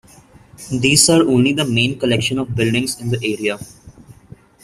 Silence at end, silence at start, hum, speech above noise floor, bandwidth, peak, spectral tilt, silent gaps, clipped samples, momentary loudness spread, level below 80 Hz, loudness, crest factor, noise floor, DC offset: 0.5 s; 0.6 s; none; 29 dB; 16 kHz; 0 dBFS; -4 dB/octave; none; under 0.1%; 12 LU; -48 dBFS; -16 LUFS; 18 dB; -46 dBFS; under 0.1%